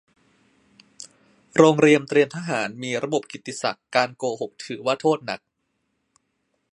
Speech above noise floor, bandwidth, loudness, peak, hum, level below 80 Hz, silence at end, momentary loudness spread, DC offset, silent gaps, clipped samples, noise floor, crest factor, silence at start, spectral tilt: 53 dB; 11 kHz; -22 LUFS; 0 dBFS; none; -70 dBFS; 1.35 s; 17 LU; under 0.1%; none; under 0.1%; -74 dBFS; 24 dB; 1.55 s; -5 dB/octave